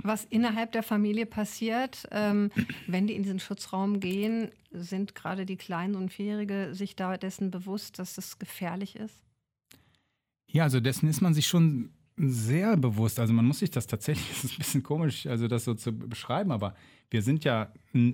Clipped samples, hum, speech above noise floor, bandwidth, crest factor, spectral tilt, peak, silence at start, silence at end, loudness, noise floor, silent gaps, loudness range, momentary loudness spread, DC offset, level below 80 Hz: under 0.1%; none; 50 dB; 17 kHz; 18 dB; -6 dB/octave; -12 dBFS; 0.05 s; 0 s; -30 LUFS; -79 dBFS; none; 8 LU; 12 LU; under 0.1%; -64 dBFS